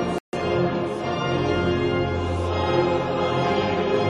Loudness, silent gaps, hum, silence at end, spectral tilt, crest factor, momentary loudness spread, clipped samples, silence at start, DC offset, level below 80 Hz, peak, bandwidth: -23 LUFS; 0.20-0.32 s; none; 0 s; -7 dB/octave; 14 dB; 4 LU; under 0.1%; 0 s; under 0.1%; -44 dBFS; -8 dBFS; 10.5 kHz